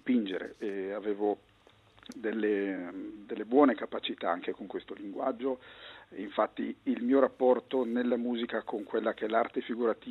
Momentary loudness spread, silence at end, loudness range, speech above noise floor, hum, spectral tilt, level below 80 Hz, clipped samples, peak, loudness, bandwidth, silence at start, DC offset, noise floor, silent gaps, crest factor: 14 LU; 0 s; 5 LU; 29 dB; none; -6.5 dB/octave; -74 dBFS; under 0.1%; -10 dBFS; -32 LUFS; 6.6 kHz; 0.05 s; under 0.1%; -60 dBFS; none; 20 dB